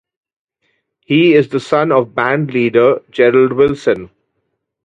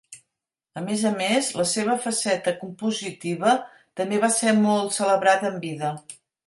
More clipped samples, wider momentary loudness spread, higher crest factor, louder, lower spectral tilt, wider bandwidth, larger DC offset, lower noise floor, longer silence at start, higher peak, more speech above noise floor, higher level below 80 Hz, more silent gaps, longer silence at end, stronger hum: neither; second, 6 LU vs 11 LU; about the same, 14 dB vs 18 dB; first, -13 LUFS vs -23 LUFS; first, -7 dB/octave vs -3.5 dB/octave; second, 9 kHz vs 11.5 kHz; neither; second, -70 dBFS vs -84 dBFS; first, 1.1 s vs 0.1 s; first, 0 dBFS vs -6 dBFS; about the same, 58 dB vs 61 dB; first, -52 dBFS vs -72 dBFS; neither; first, 0.8 s vs 0.3 s; neither